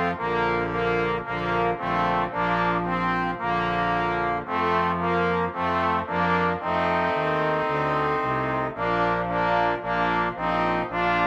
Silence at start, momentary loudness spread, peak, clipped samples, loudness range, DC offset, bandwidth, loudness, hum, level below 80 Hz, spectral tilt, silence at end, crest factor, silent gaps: 0 s; 2 LU; -10 dBFS; under 0.1%; 1 LU; under 0.1%; 7.8 kHz; -24 LUFS; none; -46 dBFS; -7 dB/octave; 0 s; 14 dB; none